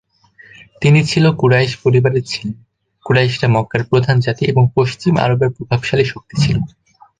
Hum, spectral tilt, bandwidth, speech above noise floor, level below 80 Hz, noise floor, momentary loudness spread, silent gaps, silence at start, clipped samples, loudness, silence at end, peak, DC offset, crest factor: none; -6.5 dB/octave; 9.4 kHz; 32 dB; -44 dBFS; -46 dBFS; 7 LU; none; 0.8 s; under 0.1%; -15 LUFS; 0.5 s; -2 dBFS; under 0.1%; 14 dB